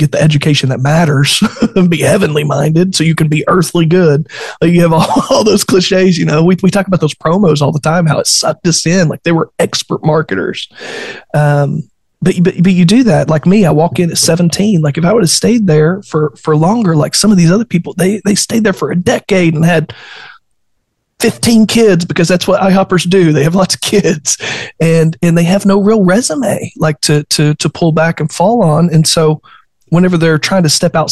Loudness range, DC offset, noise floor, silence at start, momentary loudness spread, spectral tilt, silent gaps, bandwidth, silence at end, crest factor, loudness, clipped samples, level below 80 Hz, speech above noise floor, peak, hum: 3 LU; under 0.1%; -64 dBFS; 0 s; 6 LU; -5 dB/octave; none; 12.5 kHz; 0 s; 10 dB; -10 LUFS; under 0.1%; -42 dBFS; 55 dB; 0 dBFS; none